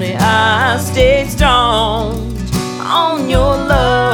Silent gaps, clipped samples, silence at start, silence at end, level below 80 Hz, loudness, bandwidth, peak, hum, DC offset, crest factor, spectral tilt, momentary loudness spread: none; under 0.1%; 0 s; 0 s; -22 dBFS; -13 LUFS; 19.5 kHz; 0 dBFS; none; under 0.1%; 12 dB; -4.5 dB/octave; 8 LU